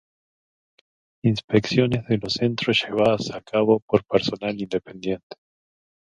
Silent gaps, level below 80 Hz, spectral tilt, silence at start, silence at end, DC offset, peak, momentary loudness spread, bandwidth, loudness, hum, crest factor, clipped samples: 1.44-1.48 s, 3.82-3.88 s, 5.23-5.30 s; -56 dBFS; -6 dB/octave; 1.25 s; 0.7 s; under 0.1%; -2 dBFS; 9 LU; 10 kHz; -23 LUFS; none; 22 dB; under 0.1%